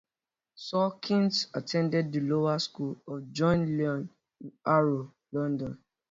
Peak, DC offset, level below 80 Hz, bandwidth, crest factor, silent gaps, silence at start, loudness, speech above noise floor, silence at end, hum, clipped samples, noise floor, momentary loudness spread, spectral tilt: -12 dBFS; under 0.1%; -64 dBFS; 7.8 kHz; 18 dB; none; 0.6 s; -29 LUFS; over 61 dB; 0.35 s; none; under 0.1%; under -90 dBFS; 14 LU; -6.5 dB/octave